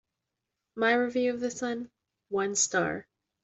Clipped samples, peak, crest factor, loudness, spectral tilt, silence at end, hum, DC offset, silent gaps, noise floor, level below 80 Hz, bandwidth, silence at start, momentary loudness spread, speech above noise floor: under 0.1%; -12 dBFS; 18 dB; -29 LUFS; -2.5 dB/octave; 0.4 s; none; under 0.1%; none; -86 dBFS; -70 dBFS; 8.2 kHz; 0.75 s; 14 LU; 57 dB